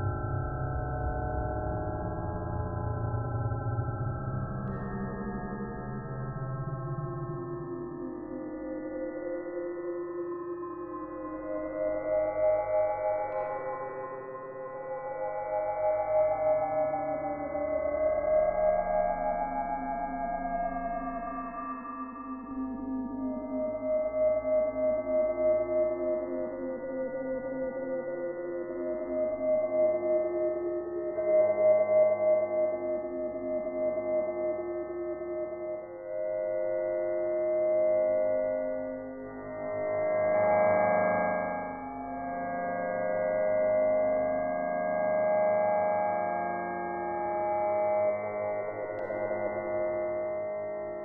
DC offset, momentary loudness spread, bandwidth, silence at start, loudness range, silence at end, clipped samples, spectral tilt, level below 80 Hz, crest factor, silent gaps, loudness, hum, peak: under 0.1%; 11 LU; 2.8 kHz; 0 s; 8 LU; 0 s; under 0.1%; -3.5 dB/octave; -50 dBFS; 14 dB; none; -31 LUFS; none; -16 dBFS